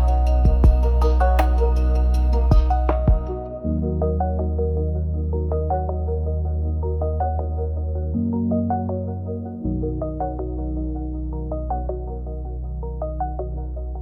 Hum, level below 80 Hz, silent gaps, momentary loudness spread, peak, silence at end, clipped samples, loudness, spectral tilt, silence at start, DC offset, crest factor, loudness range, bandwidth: none; -22 dBFS; none; 11 LU; -4 dBFS; 0 s; under 0.1%; -23 LUFS; -9.5 dB/octave; 0 s; 0.1%; 16 dB; 9 LU; 5.8 kHz